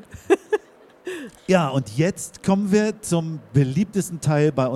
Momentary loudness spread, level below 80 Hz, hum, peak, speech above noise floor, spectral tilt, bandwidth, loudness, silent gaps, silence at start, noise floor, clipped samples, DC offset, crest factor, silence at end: 13 LU; -54 dBFS; none; -4 dBFS; 28 dB; -6.5 dB/octave; 14.5 kHz; -22 LUFS; none; 0.1 s; -49 dBFS; under 0.1%; under 0.1%; 18 dB; 0 s